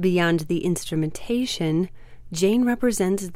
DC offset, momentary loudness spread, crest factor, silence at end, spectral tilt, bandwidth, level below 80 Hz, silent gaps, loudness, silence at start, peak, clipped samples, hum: under 0.1%; 7 LU; 14 dB; 0 s; -5.5 dB/octave; 16.5 kHz; -46 dBFS; none; -23 LUFS; 0 s; -8 dBFS; under 0.1%; none